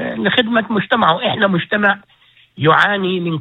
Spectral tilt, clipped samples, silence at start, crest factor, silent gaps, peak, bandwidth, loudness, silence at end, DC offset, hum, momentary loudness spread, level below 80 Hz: -7 dB/octave; under 0.1%; 0 s; 16 dB; none; 0 dBFS; 8.8 kHz; -15 LUFS; 0 s; under 0.1%; none; 6 LU; -58 dBFS